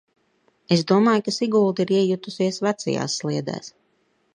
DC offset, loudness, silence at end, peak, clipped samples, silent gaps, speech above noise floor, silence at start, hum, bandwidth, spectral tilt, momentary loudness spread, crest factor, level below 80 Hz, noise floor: under 0.1%; -22 LUFS; 0.65 s; -4 dBFS; under 0.1%; none; 45 dB; 0.7 s; none; 10.5 kHz; -5.5 dB/octave; 10 LU; 18 dB; -68 dBFS; -67 dBFS